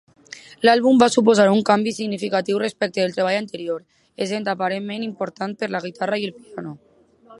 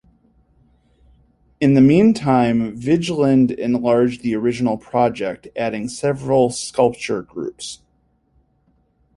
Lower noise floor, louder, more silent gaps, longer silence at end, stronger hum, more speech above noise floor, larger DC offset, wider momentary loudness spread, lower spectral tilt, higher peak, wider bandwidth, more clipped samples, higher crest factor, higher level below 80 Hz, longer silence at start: second, -50 dBFS vs -62 dBFS; about the same, -20 LUFS vs -18 LUFS; neither; second, 0.05 s vs 1.4 s; neither; second, 30 dB vs 45 dB; neither; first, 18 LU vs 13 LU; second, -5 dB/octave vs -6.5 dB/octave; about the same, 0 dBFS vs -2 dBFS; about the same, 11.5 kHz vs 11.5 kHz; neither; about the same, 20 dB vs 16 dB; second, -66 dBFS vs -52 dBFS; second, 0.35 s vs 1.6 s